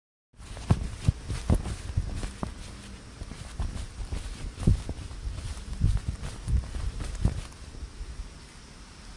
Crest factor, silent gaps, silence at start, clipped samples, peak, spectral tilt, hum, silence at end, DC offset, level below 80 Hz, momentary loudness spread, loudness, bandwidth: 24 dB; none; 0.35 s; under 0.1%; -8 dBFS; -6 dB/octave; none; 0 s; under 0.1%; -34 dBFS; 15 LU; -33 LUFS; 11.5 kHz